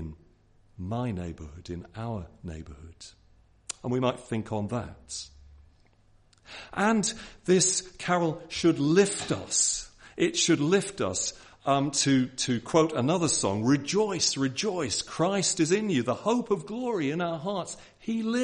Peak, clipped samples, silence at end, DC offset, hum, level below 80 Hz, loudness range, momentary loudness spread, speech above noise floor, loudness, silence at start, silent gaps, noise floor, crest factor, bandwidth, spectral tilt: -8 dBFS; under 0.1%; 0 s; under 0.1%; none; -58 dBFS; 9 LU; 16 LU; 33 dB; -27 LUFS; 0 s; none; -61 dBFS; 20 dB; 11 kHz; -4 dB/octave